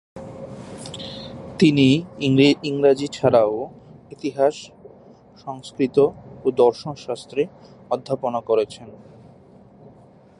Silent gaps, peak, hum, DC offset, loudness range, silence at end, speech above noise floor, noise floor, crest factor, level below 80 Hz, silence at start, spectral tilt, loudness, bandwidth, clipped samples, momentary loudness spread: none; -2 dBFS; none; under 0.1%; 6 LU; 1.45 s; 29 dB; -49 dBFS; 20 dB; -56 dBFS; 0.15 s; -6.5 dB/octave; -20 LUFS; 11.5 kHz; under 0.1%; 20 LU